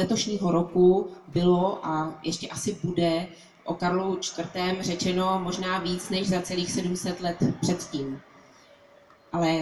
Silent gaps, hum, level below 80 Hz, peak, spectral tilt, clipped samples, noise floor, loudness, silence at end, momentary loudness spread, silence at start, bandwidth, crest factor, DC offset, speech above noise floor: none; none; -54 dBFS; -10 dBFS; -5 dB/octave; under 0.1%; -55 dBFS; -27 LUFS; 0 s; 9 LU; 0 s; 12 kHz; 18 dB; under 0.1%; 29 dB